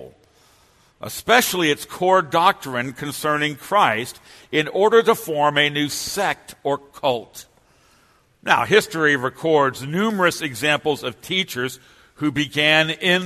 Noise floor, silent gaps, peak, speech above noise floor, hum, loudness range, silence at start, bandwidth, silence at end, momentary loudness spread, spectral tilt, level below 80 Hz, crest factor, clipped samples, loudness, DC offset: -58 dBFS; none; 0 dBFS; 38 dB; none; 3 LU; 0 s; 13.5 kHz; 0 s; 11 LU; -3.5 dB/octave; -58 dBFS; 20 dB; under 0.1%; -19 LUFS; under 0.1%